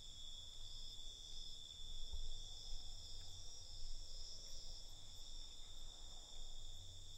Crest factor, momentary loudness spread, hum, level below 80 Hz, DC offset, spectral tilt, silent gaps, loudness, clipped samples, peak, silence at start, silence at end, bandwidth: 14 dB; 4 LU; none; -52 dBFS; under 0.1%; -1.5 dB/octave; none; -54 LUFS; under 0.1%; -34 dBFS; 0 s; 0 s; 13.5 kHz